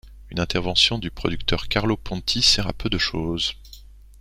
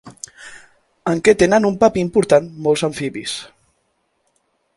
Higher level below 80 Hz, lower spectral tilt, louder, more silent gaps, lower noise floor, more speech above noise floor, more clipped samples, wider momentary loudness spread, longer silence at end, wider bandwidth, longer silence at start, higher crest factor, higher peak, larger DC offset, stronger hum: first, -36 dBFS vs -50 dBFS; second, -3.5 dB/octave vs -5 dB/octave; second, -22 LUFS vs -17 LUFS; neither; second, -44 dBFS vs -67 dBFS; second, 22 dB vs 51 dB; neither; second, 10 LU vs 21 LU; second, 0.2 s vs 1.3 s; first, 16 kHz vs 11.5 kHz; about the same, 0.05 s vs 0.05 s; about the same, 20 dB vs 18 dB; second, -4 dBFS vs 0 dBFS; neither; neither